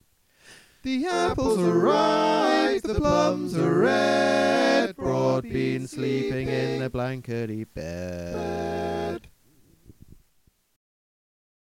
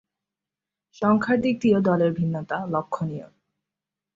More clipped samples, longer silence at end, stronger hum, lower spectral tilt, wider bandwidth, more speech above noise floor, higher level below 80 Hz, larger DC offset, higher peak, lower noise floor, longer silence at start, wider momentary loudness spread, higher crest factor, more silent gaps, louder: neither; first, 1.6 s vs 0.9 s; neither; second, -5.5 dB/octave vs -8 dB/octave; first, 16 kHz vs 7.6 kHz; second, 41 dB vs 66 dB; first, -48 dBFS vs -62 dBFS; neither; about the same, -8 dBFS vs -8 dBFS; second, -65 dBFS vs -88 dBFS; second, 0.5 s vs 1 s; about the same, 12 LU vs 10 LU; about the same, 18 dB vs 18 dB; neither; about the same, -24 LUFS vs -23 LUFS